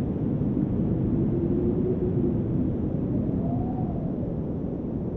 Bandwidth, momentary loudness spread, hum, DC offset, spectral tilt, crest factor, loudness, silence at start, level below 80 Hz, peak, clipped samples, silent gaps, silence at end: 3.7 kHz; 5 LU; none; under 0.1%; -13 dB/octave; 14 dB; -27 LUFS; 0 s; -38 dBFS; -12 dBFS; under 0.1%; none; 0 s